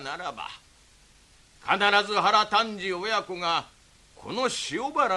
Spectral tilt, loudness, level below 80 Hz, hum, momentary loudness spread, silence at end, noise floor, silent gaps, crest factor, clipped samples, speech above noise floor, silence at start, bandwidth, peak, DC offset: -2.5 dB/octave; -25 LUFS; -62 dBFS; none; 16 LU; 0 s; -57 dBFS; none; 22 dB; under 0.1%; 31 dB; 0 s; 12 kHz; -6 dBFS; under 0.1%